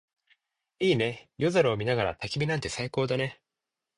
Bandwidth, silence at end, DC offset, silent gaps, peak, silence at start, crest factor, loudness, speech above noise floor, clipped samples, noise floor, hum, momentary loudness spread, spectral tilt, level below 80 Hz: 11 kHz; 0.65 s; under 0.1%; none; -10 dBFS; 0.8 s; 18 dB; -28 LUFS; 60 dB; under 0.1%; -88 dBFS; none; 6 LU; -5.5 dB/octave; -58 dBFS